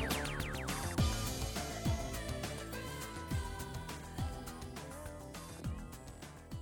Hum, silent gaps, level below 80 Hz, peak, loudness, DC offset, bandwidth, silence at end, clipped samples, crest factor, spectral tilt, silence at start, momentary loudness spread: none; none; -46 dBFS; -20 dBFS; -41 LUFS; under 0.1%; over 20 kHz; 0 s; under 0.1%; 20 dB; -4.5 dB/octave; 0 s; 12 LU